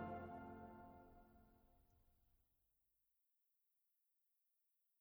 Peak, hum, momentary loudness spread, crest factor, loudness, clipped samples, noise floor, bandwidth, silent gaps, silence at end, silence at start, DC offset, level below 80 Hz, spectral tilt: -40 dBFS; none; 14 LU; 22 dB; -57 LUFS; under 0.1%; -87 dBFS; over 20 kHz; none; 2.65 s; 0 s; under 0.1%; -78 dBFS; -8 dB/octave